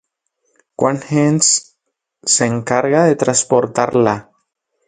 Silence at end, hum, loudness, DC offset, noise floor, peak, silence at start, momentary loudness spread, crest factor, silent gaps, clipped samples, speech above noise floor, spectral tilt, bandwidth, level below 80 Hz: 0.65 s; none; -15 LUFS; under 0.1%; -73 dBFS; 0 dBFS; 0.8 s; 6 LU; 16 dB; none; under 0.1%; 59 dB; -4 dB/octave; 9.6 kHz; -56 dBFS